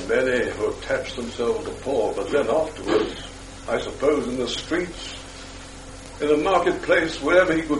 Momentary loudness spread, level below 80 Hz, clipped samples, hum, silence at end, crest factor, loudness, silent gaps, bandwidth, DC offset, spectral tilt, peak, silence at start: 18 LU; -44 dBFS; under 0.1%; none; 0 s; 18 dB; -23 LUFS; none; 11.5 kHz; under 0.1%; -4.5 dB/octave; -4 dBFS; 0 s